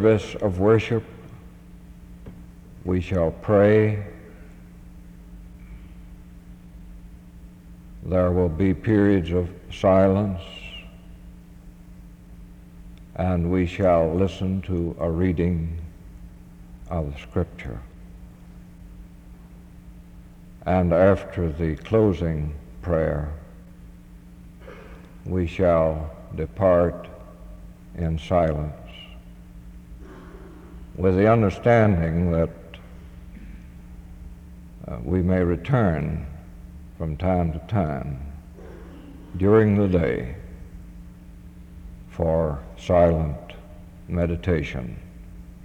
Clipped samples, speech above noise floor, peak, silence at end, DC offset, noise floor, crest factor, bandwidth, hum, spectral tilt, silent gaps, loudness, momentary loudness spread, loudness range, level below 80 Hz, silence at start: under 0.1%; 23 dB; -6 dBFS; 0 s; under 0.1%; -44 dBFS; 20 dB; 9.4 kHz; none; -9 dB/octave; none; -23 LUFS; 26 LU; 10 LU; -40 dBFS; 0 s